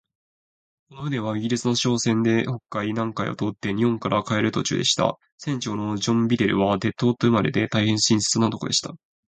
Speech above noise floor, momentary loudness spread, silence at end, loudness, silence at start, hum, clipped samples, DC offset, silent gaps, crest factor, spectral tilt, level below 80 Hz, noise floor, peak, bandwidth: over 67 dB; 8 LU; 0.3 s; -23 LUFS; 0.9 s; none; under 0.1%; under 0.1%; 5.32-5.38 s; 18 dB; -4.5 dB/octave; -56 dBFS; under -90 dBFS; -4 dBFS; 9.4 kHz